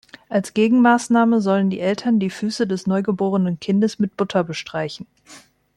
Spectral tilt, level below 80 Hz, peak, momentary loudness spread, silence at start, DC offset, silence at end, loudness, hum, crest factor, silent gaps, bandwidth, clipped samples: -6.5 dB/octave; -62 dBFS; -4 dBFS; 11 LU; 0.3 s; under 0.1%; 0.4 s; -19 LUFS; none; 16 dB; none; 11.5 kHz; under 0.1%